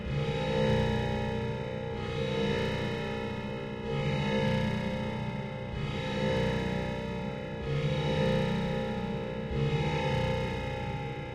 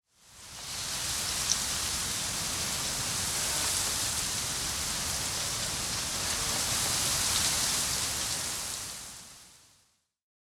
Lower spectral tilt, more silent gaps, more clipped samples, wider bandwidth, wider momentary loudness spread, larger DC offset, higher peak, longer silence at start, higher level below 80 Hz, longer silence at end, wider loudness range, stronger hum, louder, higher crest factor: first, -7 dB/octave vs -0.5 dB/octave; neither; neither; second, 11.5 kHz vs 17.5 kHz; second, 7 LU vs 10 LU; neither; second, -16 dBFS vs -8 dBFS; second, 0 s vs 0.25 s; first, -44 dBFS vs -50 dBFS; second, 0 s vs 0.95 s; about the same, 2 LU vs 2 LU; neither; second, -32 LUFS vs -29 LUFS; second, 16 dB vs 24 dB